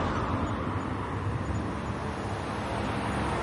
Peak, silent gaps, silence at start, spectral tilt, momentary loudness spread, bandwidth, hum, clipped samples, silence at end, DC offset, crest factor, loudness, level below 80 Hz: -18 dBFS; none; 0 s; -6.5 dB/octave; 3 LU; 11.5 kHz; none; under 0.1%; 0 s; under 0.1%; 12 dB; -32 LUFS; -42 dBFS